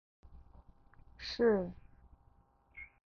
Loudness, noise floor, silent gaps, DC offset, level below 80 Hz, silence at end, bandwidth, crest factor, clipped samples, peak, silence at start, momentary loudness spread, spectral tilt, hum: -34 LUFS; -68 dBFS; none; under 0.1%; -60 dBFS; 0.2 s; 6.8 kHz; 20 dB; under 0.1%; -20 dBFS; 0.3 s; 25 LU; -4.5 dB/octave; none